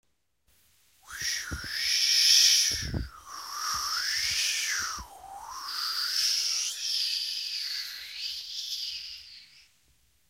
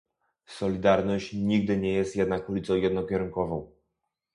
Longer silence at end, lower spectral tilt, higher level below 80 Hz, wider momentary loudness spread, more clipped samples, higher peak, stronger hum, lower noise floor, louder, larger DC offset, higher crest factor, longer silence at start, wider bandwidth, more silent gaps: first, 0.85 s vs 0.7 s; second, 1 dB/octave vs -7 dB/octave; about the same, -52 dBFS vs -52 dBFS; first, 19 LU vs 8 LU; neither; about the same, -8 dBFS vs -8 dBFS; neither; second, -72 dBFS vs -82 dBFS; about the same, -26 LUFS vs -27 LUFS; neither; about the same, 22 dB vs 18 dB; first, 1.05 s vs 0.5 s; first, 16 kHz vs 10.5 kHz; neither